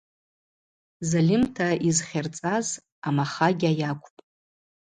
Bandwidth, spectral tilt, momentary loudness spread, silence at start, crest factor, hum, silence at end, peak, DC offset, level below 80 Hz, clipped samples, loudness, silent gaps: 9.6 kHz; -5 dB/octave; 9 LU; 1 s; 20 dB; none; 0.9 s; -8 dBFS; under 0.1%; -60 dBFS; under 0.1%; -25 LUFS; 2.92-3.02 s